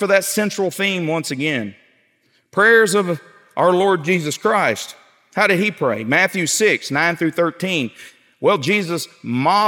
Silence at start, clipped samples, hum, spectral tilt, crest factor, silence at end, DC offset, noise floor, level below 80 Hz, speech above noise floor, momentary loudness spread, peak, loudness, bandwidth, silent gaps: 0 s; under 0.1%; none; -4 dB/octave; 18 dB; 0 s; under 0.1%; -61 dBFS; -74 dBFS; 44 dB; 10 LU; -2 dBFS; -18 LUFS; 17.5 kHz; none